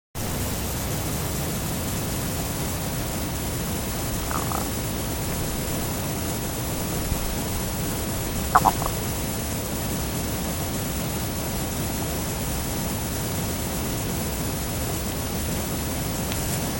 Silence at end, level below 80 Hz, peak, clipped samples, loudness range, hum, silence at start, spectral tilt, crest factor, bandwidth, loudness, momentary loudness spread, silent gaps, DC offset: 0 s; -34 dBFS; 0 dBFS; under 0.1%; 2 LU; none; 0.15 s; -4 dB/octave; 26 dB; 17 kHz; -26 LUFS; 2 LU; none; under 0.1%